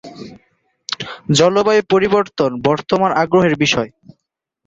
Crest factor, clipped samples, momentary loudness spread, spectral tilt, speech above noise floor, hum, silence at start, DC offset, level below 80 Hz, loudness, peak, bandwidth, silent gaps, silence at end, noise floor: 16 dB; under 0.1%; 14 LU; -5 dB/octave; 61 dB; none; 0.05 s; under 0.1%; -52 dBFS; -15 LUFS; 0 dBFS; 8.2 kHz; none; 0.8 s; -75 dBFS